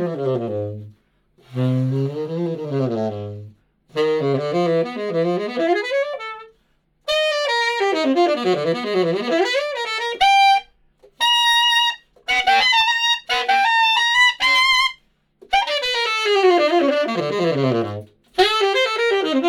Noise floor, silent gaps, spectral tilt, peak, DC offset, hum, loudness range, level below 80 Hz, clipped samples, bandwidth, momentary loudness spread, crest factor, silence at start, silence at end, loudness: -63 dBFS; none; -4 dB/octave; -2 dBFS; under 0.1%; none; 8 LU; -58 dBFS; under 0.1%; 19 kHz; 13 LU; 16 dB; 0 s; 0 s; -18 LUFS